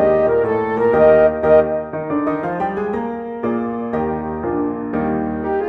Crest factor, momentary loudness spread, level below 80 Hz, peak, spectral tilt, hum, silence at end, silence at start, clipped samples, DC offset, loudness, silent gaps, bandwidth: 16 dB; 10 LU; -42 dBFS; -2 dBFS; -9.5 dB/octave; none; 0 s; 0 s; under 0.1%; under 0.1%; -18 LUFS; none; 4.6 kHz